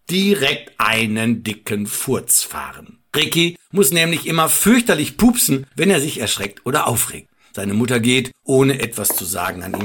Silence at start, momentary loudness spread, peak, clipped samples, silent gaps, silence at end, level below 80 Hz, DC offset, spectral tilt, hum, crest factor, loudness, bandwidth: 0.1 s; 9 LU; -2 dBFS; under 0.1%; none; 0 s; -46 dBFS; 0.1%; -3.5 dB/octave; none; 16 dB; -17 LUFS; 19 kHz